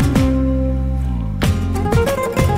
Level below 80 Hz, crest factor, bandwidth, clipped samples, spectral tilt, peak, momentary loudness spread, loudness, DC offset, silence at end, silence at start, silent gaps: -22 dBFS; 14 dB; 16 kHz; under 0.1%; -7 dB/octave; -2 dBFS; 5 LU; -18 LUFS; under 0.1%; 0 s; 0 s; none